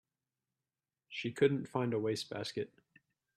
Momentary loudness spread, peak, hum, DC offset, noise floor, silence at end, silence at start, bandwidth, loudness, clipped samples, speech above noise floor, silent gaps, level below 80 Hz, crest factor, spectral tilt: 12 LU; -16 dBFS; none; under 0.1%; under -90 dBFS; 0.7 s; 1.1 s; 12.5 kHz; -36 LUFS; under 0.1%; over 55 dB; none; -78 dBFS; 22 dB; -6 dB/octave